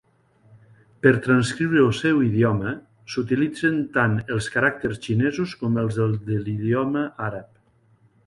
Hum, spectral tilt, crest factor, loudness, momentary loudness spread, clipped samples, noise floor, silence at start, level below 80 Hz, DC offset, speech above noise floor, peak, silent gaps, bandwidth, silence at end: none; -7 dB/octave; 20 dB; -22 LUFS; 10 LU; under 0.1%; -59 dBFS; 1.05 s; -54 dBFS; under 0.1%; 38 dB; -2 dBFS; none; 11.5 kHz; 0.8 s